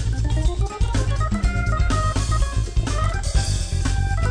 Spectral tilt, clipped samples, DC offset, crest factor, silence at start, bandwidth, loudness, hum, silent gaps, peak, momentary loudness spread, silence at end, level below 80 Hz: -5 dB/octave; under 0.1%; under 0.1%; 12 dB; 0 s; 10 kHz; -23 LUFS; none; none; -8 dBFS; 2 LU; 0 s; -22 dBFS